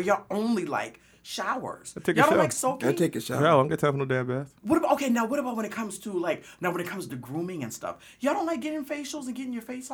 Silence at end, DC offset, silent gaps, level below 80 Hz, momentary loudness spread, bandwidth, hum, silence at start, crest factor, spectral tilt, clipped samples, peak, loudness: 0 s; under 0.1%; none; -66 dBFS; 13 LU; over 20 kHz; none; 0 s; 20 dB; -5 dB/octave; under 0.1%; -8 dBFS; -28 LUFS